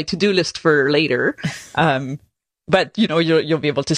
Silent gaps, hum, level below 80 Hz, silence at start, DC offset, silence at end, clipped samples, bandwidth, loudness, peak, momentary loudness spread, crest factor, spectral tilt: none; none; -52 dBFS; 0 s; under 0.1%; 0 s; under 0.1%; 13 kHz; -18 LUFS; -2 dBFS; 8 LU; 16 dB; -5 dB/octave